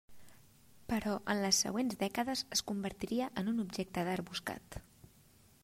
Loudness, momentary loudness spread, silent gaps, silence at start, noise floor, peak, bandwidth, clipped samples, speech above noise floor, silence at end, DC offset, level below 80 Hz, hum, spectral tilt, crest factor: -36 LUFS; 13 LU; none; 0.1 s; -64 dBFS; -18 dBFS; 16 kHz; under 0.1%; 28 dB; 0.8 s; under 0.1%; -62 dBFS; none; -3.5 dB/octave; 20 dB